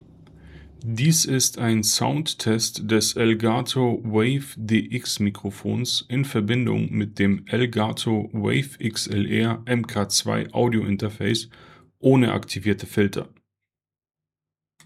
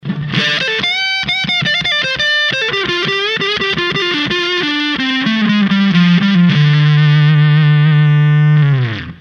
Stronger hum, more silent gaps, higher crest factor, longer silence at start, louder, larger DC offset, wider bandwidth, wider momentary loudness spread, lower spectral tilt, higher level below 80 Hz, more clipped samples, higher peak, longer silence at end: neither; neither; first, 18 dB vs 12 dB; first, 0.35 s vs 0.05 s; second, -23 LUFS vs -12 LUFS; neither; first, 15.5 kHz vs 6.8 kHz; about the same, 7 LU vs 5 LU; second, -4.5 dB/octave vs -6 dB/octave; second, -60 dBFS vs -48 dBFS; neither; second, -4 dBFS vs 0 dBFS; first, 1.6 s vs 0.05 s